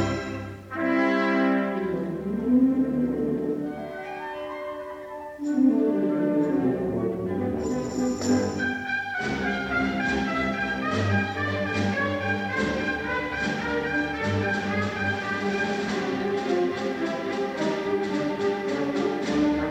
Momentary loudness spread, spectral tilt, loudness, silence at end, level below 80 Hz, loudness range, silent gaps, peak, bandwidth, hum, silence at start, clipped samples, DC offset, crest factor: 8 LU; -6 dB/octave; -26 LUFS; 0 s; -50 dBFS; 2 LU; none; -10 dBFS; 11.5 kHz; none; 0 s; under 0.1%; under 0.1%; 14 dB